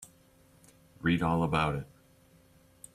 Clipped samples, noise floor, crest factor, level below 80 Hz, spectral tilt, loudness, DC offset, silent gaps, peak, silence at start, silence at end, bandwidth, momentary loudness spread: under 0.1%; -62 dBFS; 20 dB; -54 dBFS; -6.5 dB/octave; -30 LUFS; under 0.1%; none; -14 dBFS; 0 s; 1.1 s; 14 kHz; 20 LU